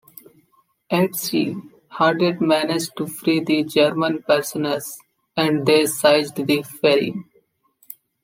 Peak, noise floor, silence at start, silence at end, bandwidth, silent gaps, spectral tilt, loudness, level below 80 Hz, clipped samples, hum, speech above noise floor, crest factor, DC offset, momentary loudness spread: -2 dBFS; -62 dBFS; 0.9 s; 1 s; 16.5 kHz; none; -4.5 dB/octave; -20 LUFS; -68 dBFS; under 0.1%; none; 43 dB; 18 dB; under 0.1%; 17 LU